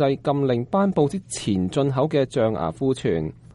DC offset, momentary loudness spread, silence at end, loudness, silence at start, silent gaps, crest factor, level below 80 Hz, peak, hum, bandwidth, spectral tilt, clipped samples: under 0.1%; 4 LU; 0.2 s; -23 LUFS; 0 s; none; 14 dB; -50 dBFS; -8 dBFS; none; 11.5 kHz; -6.5 dB/octave; under 0.1%